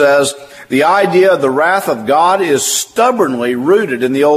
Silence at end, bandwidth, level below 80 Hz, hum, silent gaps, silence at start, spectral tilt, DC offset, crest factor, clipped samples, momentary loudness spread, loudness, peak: 0 s; 15.5 kHz; -60 dBFS; none; none; 0 s; -3.5 dB/octave; under 0.1%; 12 dB; under 0.1%; 5 LU; -12 LUFS; 0 dBFS